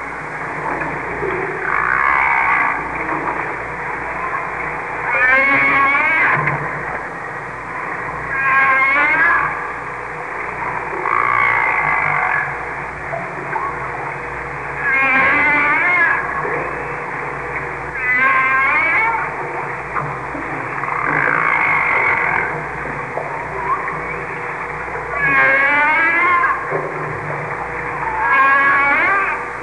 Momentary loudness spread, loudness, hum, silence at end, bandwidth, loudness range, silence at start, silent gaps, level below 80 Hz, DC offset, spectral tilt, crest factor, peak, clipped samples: 12 LU; -16 LUFS; none; 0 s; 10.5 kHz; 3 LU; 0 s; none; -44 dBFS; 0.3%; -5.5 dB/octave; 14 dB; -2 dBFS; under 0.1%